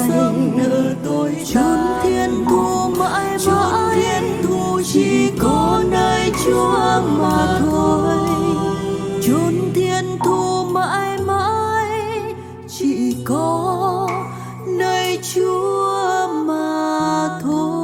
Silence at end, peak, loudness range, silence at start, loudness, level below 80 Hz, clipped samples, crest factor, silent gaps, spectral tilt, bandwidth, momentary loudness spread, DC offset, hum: 0 s; -2 dBFS; 4 LU; 0 s; -18 LUFS; -42 dBFS; under 0.1%; 14 dB; none; -5.5 dB/octave; 17.5 kHz; 5 LU; under 0.1%; none